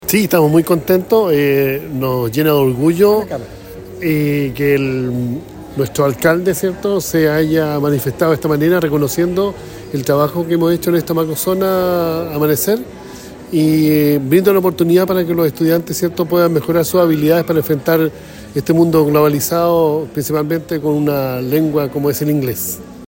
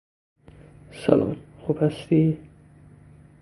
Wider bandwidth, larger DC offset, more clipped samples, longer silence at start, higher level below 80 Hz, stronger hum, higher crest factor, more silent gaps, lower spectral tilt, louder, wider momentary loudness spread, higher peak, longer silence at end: first, 16.5 kHz vs 11.5 kHz; neither; neither; second, 0 s vs 0.95 s; first, -44 dBFS vs -54 dBFS; second, none vs 50 Hz at -45 dBFS; second, 14 dB vs 24 dB; neither; second, -6 dB/octave vs -9 dB/octave; first, -15 LUFS vs -24 LUFS; second, 9 LU vs 13 LU; about the same, 0 dBFS vs -2 dBFS; second, 0 s vs 1.05 s